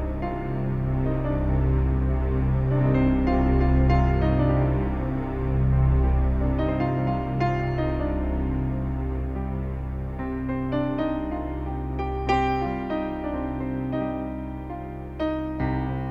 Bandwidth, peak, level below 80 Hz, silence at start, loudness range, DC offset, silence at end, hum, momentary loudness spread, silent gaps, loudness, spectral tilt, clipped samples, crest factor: 5.2 kHz; -10 dBFS; -28 dBFS; 0 s; 6 LU; under 0.1%; 0 s; none; 9 LU; none; -25 LUFS; -9.5 dB/octave; under 0.1%; 14 dB